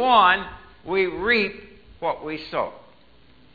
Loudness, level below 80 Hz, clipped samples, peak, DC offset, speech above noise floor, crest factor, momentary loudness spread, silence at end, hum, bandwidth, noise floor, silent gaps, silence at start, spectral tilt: -22 LUFS; -52 dBFS; under 0.1%; -4 dBFS; 0.2%; 33 dB; 20 dB; 18 LU; 0.8 s; none; 4.9 kHz; -55 dBFS; none; 0 s; -6.5 dB/octave